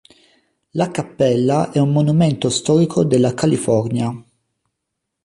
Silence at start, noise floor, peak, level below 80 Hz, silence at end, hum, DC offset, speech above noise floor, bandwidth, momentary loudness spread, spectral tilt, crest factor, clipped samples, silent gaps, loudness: 0.75 s; -78 dBFS; -4 dBFS; -54 dBFS; 1.05 s; none; under 0.1%; 62 dB; 11.5 kHz; 7 LU; -6.5 dB/octave; 14 dB; under 0.1%; none; -17 LUFS